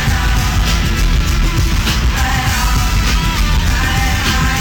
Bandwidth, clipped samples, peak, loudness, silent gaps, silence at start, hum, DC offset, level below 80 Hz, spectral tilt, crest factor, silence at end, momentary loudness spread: 19 kHz; under 0.1%; -6 dBFS; -15 LUFS; none; 0 s; none; under 0.1%; -16 dBFS; -4 dB/octave; 6 dB; 0 s; 1 LU